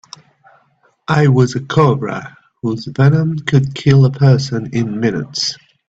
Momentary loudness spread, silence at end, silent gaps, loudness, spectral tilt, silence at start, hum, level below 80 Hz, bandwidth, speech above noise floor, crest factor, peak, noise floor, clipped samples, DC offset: 11 LU; 0.35 s; none; -15 LUFS; -6.5 dB/octave; 1.1 s; none; -48 dBFS; 8 kHz; 43 dB; 14 dB; 0 dBFS; -57 dBFS; under 0.1%; under 0.1%